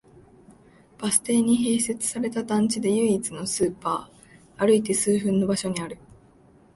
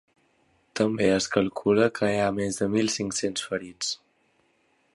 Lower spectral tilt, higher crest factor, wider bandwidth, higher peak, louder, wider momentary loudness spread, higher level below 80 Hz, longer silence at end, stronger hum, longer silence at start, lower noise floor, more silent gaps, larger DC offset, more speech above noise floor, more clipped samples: about the same, -4.5 dB/octave vs -4 dB/octave; about the same, 20 dB vs 22 dB; about the same, 12 kHz vs 11.5 kHz; about the same, -4 dBFS vs -6 dBFS; about the same, -24 LUFS vs -25 LUFS; about the same, 9 LU vs 8 LU; about the same, -60 dBFS vs -58 dBFS; second, 0.8 s vs 1 s; neither; second, 0.5 s vs 0.75 s; second, -55 dBFS vs -67 dBFS; neither; neither; second, 32 dB vs 42 dB; neither